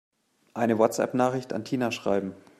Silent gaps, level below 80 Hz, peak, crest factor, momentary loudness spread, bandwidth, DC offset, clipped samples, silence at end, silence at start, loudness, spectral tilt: none; -70 dBFS; -8 dBFS; 20 dB; 8 LU; 14.5 kHz; under 0.1%; under 0.1%; 0.2 s; 0.55 s; -27 LUFS; -5.5 dB/octave